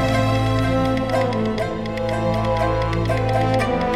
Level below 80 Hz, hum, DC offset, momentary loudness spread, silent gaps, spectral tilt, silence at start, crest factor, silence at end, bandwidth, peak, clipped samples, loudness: -32 dBFS; none; under 0.1%; 4 LU; none; -7 dB/octave; 0 s; 12 dB; 0 s; 13 kHz; -6 dBFS; under 0.1%; -20 LUFS